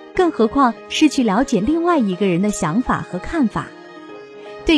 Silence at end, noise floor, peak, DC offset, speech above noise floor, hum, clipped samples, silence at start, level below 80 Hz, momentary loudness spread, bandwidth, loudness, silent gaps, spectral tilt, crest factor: 0 s; -37 dBFS; -2 dBFS; under 0.1%; 20 dB; none; under 0.1%; 0 s; -40 dBFS; 20 LU; 11 kHz; -18 LUFS; none; -5.5 dB/octave; 16 dB